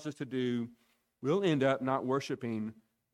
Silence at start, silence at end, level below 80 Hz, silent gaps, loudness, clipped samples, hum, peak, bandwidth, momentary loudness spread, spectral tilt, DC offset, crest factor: 0 s; 0.4 s; -76 dBFS; none; -33 LUFS; under 0.1%; none; -16 dBFS; 12.5 kHz; 10 LU; -6.5 dB/octave; under 0.1%; 18 dB